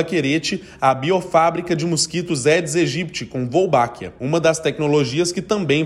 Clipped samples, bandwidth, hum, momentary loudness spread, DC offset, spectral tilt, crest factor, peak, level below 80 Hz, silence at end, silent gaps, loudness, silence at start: under 0.1%; 13.5 kHz; none; 6 LU; under 0.1%; -4.5 dB/octave; 16 dB; -4 dBFS; -52 dBFS; 0 s; none; -19 LUFS; 0 s